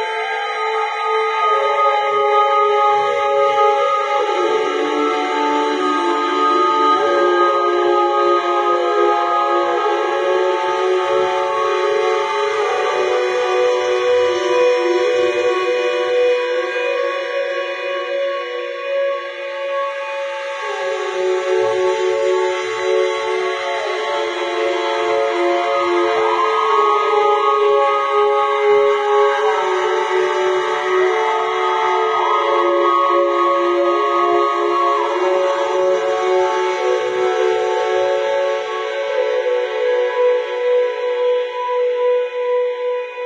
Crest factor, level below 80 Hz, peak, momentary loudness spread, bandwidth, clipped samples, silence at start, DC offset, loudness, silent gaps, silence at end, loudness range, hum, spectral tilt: 14 dB; -74 dBFS; -4 dBFS; 6 LU; 9.8 kHz; under 0.1%; 0 s; under 0.1%; -17 LUFS; none; 0 s; 4 LU; none; -2.5 dB/octave